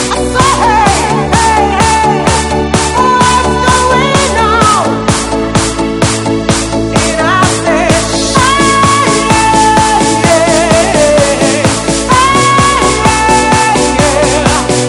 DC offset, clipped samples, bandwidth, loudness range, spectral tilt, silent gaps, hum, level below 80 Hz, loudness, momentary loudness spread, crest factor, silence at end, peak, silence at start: under 0.1%; 0.6%; 19 kHz; 3 LU; -4 dB/octave; none; none; -24 dBFS; -8 LUFS; 4 LU; 8 dB; 0 s; 0 dBFS; 0 s